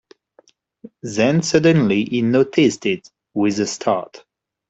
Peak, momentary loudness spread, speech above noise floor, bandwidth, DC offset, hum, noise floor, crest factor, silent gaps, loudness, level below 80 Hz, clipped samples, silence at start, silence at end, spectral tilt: -2 dBFS; 12 LU; 38 dB; 8.2 kHz; under 0.1%; none; -56 dBFS; 18 dB; none; -18 LUFS; -58 dBFS; under 0.1%; 0.85 s; 0.5 s; -5.5 dB/octave